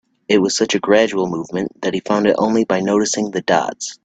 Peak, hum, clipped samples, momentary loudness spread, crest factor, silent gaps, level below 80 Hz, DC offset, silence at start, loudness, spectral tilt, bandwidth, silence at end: 0 dBFS; none; under 0.1%; 8 LU; 16 dB; none; -58 dBFS; under 0.1%; 0.3 s; -17 LUFS; -4 dB/octave; 9.2 kHz; 0.1 s